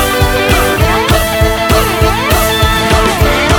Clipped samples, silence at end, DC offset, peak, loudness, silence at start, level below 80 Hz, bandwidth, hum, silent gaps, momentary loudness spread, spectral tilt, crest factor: under 0.1%; 0 s; under 0.1%; 0 dBFS; -10 LUFS; 0 s; -18 dBFS; over 20 kHz; none; none; 1 LU; -4 dB/octave; 10 dB